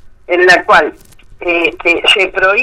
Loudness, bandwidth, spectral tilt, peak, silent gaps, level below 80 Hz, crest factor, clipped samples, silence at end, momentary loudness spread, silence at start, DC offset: -10 LUFS; 15 kHz; -2.5 dB/octave; 0 dBFS; none; -42 dBFS; 12 dB; 0.1%; 0 s; 10 LU; 0.05 s; under 0.1%